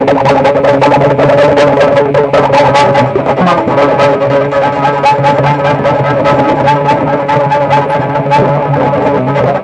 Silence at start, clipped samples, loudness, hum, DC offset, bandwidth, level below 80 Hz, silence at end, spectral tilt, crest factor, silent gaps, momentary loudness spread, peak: 0 s; under 0.1%; -8 LUFS; none; 0.2%; 9.8 kHz; -40 dBFS; 0 s; -7 dB/octave; 8 dB; none; 4 LU; 0 dBFS